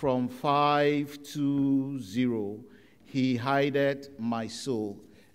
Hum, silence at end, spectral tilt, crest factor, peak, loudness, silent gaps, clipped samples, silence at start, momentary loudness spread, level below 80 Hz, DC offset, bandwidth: none; 0.3 s; -6 dB/octave; 16 dB; -12 dBFS; -29 LUFS; none; under 0.1%; 0 s; 11 LU; -66 dBFS; under 0.1%; 15.5 kHz